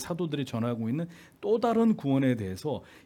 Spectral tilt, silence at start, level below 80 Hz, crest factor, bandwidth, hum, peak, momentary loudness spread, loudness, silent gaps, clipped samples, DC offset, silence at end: -7 dB/octave; 0 s; -68 dBFS; 16 dB; 15.5 kHz; none; -14 dBFS; 10 LU; -29 LUFS; none; under 0.1%; under 0.1%; 0.05 s